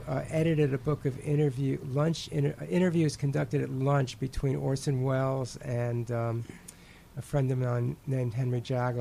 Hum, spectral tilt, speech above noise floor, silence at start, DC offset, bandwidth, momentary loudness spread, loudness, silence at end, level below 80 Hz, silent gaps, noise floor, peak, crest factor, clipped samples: none; -7.5 dB/octave; 22 dB; 0 s; under 0.1%; 14 kHz; 7 LU; -30 LUFS; 0 s; -52 dBFS; none; -51 dBFS; -14 dBFS; 14 dB; under 0.1%